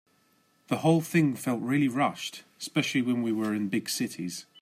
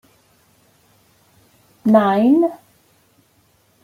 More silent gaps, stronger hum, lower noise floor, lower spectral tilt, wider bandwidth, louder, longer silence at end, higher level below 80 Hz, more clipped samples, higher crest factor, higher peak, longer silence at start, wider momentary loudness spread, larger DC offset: neither; neither; first, -67 dBFS vs -58 dBFS; second, -5 dB/octave vs -8 dB/octave; about the same, 16 kHz vs 15.5 kHz; second, -28 LUFS vs -16 LUFS; second, 0.2 s vs 1.3 s; second, -74 dBFS vs -68 dBFS; neither; about the same, 16 dB vs 18 dB; second, -12 dBFS vs -2 dBFS; second, 0.7 s vs 1.85 s; first, 12 LU vs 9 LU; neither